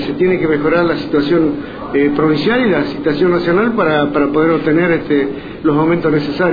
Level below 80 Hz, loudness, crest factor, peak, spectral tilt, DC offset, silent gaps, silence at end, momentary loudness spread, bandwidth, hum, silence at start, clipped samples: -42 dBFS; -14 LUFS; 12 dB; -2 dBFS; -9 dB/octave; under 0.1%; none; 0 s; 3 LU; 5 kHz; none; 0 s; under 0.1%